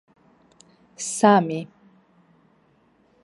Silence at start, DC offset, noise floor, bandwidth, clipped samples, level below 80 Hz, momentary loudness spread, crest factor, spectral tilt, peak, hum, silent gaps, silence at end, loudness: 1 s; under 0.1%; -61 dBFS; 11.5 kHz; under 0.1%; -74 dBFS; 16 LU; 24 dB; -5 dB/octave; -2 dBFS; none; none; 1.6 s; -21 LUFS